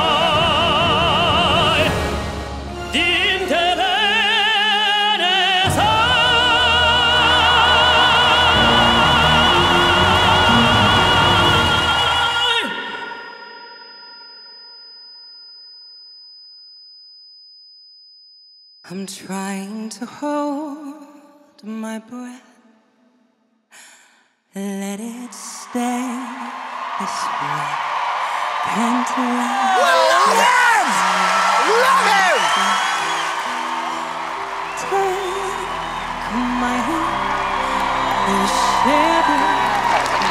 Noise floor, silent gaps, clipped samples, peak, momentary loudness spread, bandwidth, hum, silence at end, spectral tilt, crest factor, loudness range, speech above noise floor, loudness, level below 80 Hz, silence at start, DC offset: -62 dBFS; none; under 0.1%; -2 dBFS; 18 LU; 16 kHz; none; 0 s; -3 dB/octave; 16 dB; 20 LU; 44 dB; -15 LUFS; -38 dBFS; 0 s; under 0.1%